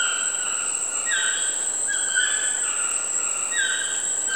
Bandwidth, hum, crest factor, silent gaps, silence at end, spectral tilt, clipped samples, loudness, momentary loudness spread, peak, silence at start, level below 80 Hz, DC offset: over 20 kHz; none; 16 dB; none; 0 s; 3 dB/octave; under 0.1%; -21 LUFS; 3 LU; -8 dBFS; 0 s; -68 dBFS; 0.3%